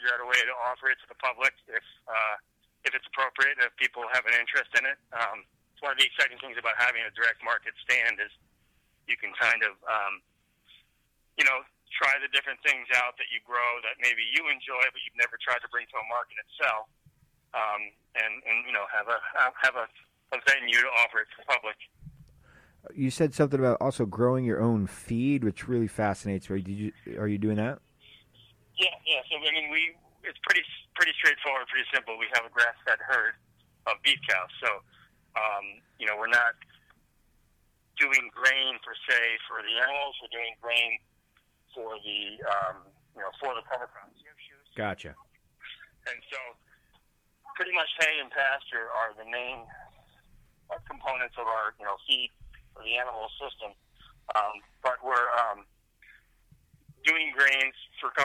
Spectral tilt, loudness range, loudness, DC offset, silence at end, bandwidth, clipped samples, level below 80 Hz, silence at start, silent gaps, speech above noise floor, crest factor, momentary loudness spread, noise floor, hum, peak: -3.5 dB/octave; 7 LU; -27 LUFS; under 0.1%; 0 s; 16 kHz; under 0.1%; -64 dBFS; 0 s; none; 42 dB; 20 dB; 14 LU; -71 dBFS; none; -10 dBFS